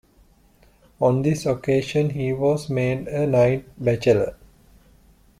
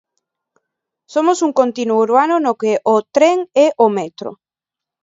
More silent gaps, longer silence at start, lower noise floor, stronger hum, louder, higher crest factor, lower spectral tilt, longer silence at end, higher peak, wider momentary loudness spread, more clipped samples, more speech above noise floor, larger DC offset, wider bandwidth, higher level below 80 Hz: neither; about the same, 1 s vs 1.1 s; second, -56 dBFS vs -87 dBFS; neither; second, -22 LUFS vs -15 LUFS; about the same, 18 dB vs 16 dB; first, -7 dB/octave vs -4.5 dB/octave; first, 1.05 s vs 0.7 s; second, -6 dBFS vs 0 dBFS; second, 5 LU vs 10 LU; neither; second, 35 dB vs 72 dB; neither; first, 14 kHz vs 7.8 kHz; first, -50 dBFS vs -68 dBFS